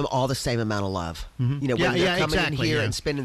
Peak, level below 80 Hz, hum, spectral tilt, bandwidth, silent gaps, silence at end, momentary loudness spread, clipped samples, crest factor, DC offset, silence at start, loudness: -14 dBFS; -42 dBFS; none; -5 dB/octave; 14.5 kHz; none; 0 s; 7 LU; under 0.1%; 10 dB; under 0.1%; 0 s; -24 LUFS